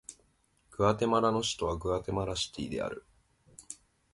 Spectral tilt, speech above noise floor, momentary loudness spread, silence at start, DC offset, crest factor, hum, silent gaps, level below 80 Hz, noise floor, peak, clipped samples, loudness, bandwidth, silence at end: -4.5 dB/octave; 39 dB; 20 LU; 0.1 s; under 0.1%; 22 dB; none; none; -52 dBFS; -70 dBFS; -12 dBFS; under 0.1%; -31 LUFS; 11.5 kHz; 0.4 s